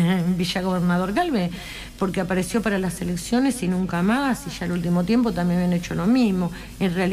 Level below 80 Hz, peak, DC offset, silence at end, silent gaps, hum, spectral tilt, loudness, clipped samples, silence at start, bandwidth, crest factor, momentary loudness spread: -44 dBFS; -12 dBFS; under 0.1%; 0 s; none; none; -6 dB/octave; -23 LUFS; under 0.1%; 0 s; 15.5 kHz; 10 dB; 7 LU